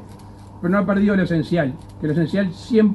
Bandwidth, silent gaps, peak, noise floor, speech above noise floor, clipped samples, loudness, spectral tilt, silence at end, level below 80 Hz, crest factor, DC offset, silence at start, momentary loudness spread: 11 kHz; none; -6 dBFS; -39 dBFS; 21 dB; under 0.1%; -20 LUFS; -8.5 dB/octave; 0 s; -46 dBFS; 14 dB; under 0.1%; 0 s; 10 LU